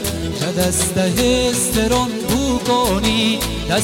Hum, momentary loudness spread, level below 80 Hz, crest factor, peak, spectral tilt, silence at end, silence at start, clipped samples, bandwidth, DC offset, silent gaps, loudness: none; 4 LU; -30 dBFS; 14 dB; -4 dBFS; -4 dB/octave; 0 s; 0 s; under 0.1%; 17 kHz; under 0.1%; none; -17 LUFS